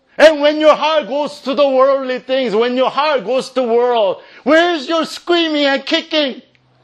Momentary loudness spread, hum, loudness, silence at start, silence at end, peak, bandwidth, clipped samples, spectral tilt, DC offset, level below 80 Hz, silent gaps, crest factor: 7 LU; none; -14 LUFS; 0.2 s; 0.45 s; 0 dBFS; 11.5 kHz; 0.2%; -3.5 dB/octave; under 0.1%; -62 dBFS; none; 14 dB